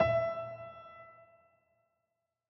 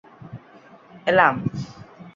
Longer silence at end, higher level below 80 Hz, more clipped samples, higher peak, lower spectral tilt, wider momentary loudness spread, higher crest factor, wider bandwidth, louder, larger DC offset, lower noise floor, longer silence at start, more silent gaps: first, 1.35 s vs 0.05 s; about the same, -62 dBFS vs -58 dBFS; neither; second, -16 dBFS vs -2 dBFS; first, -8 dB/octave vs -6.5 dB/octave; about the same, 23 LU vs 25 LU; about the same, 22 dB vs 24 dB; second, 5.8 kHz vs 7.6 kHz; second, -35 LUFS vs -20 LUFS; neither; first, -86 dBFS vs -49 dBFS; second, 0 s vs 0.2 s; neither